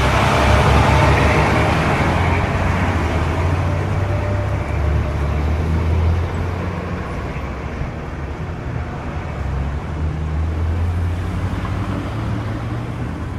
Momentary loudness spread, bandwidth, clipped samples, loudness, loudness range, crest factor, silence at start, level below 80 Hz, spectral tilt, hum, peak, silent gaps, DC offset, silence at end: 12 LU; 13 kHz; under 0.1%; -19 LUFS; 9 LU; 16 dB; 0 s; -24 dBFS; -6.5 dB/octave; none; -2 dBFS; none; under 0.1%; 0 s